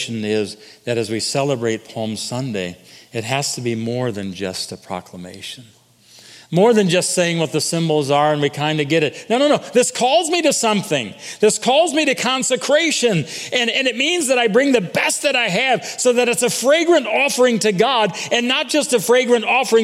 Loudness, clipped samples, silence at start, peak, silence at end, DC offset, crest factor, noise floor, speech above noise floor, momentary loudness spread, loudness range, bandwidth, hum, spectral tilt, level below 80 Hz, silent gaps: -17 LUFS; under 0.1%; 0 s; -2 dBFS; 0 s; under 0.1%; 16 dB; -48 dBFS; 30 dB; 11 LU; 8 LU; 16 kHz; none; -3.5 dB/octave; -66 dBFS; none